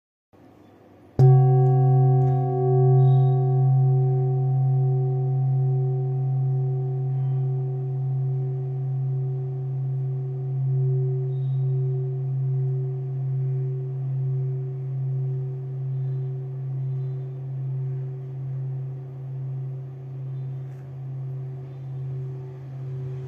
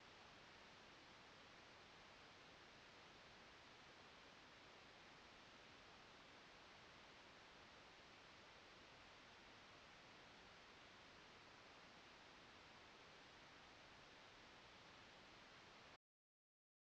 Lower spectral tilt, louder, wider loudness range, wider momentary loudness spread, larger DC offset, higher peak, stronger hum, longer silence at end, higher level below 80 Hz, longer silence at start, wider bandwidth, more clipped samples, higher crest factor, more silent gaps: first, -12.5 dB/octave vs -3 dB/octave; first, -24 LUFS vs -64 LUFS; first, 13 LU vs 0 LU; first, 15 LU vs 0 LU; neither; first, -6 dBFS vs -52 dBFS; neither; second, 0 s vs 1 s; first, -64 dBFS vs -84 dBFS; first, 1.2 s vs 0 s; second, 1.7 kHz vs 8.4 kHz; neither; about the same, 16 dB vs 14 dB; neither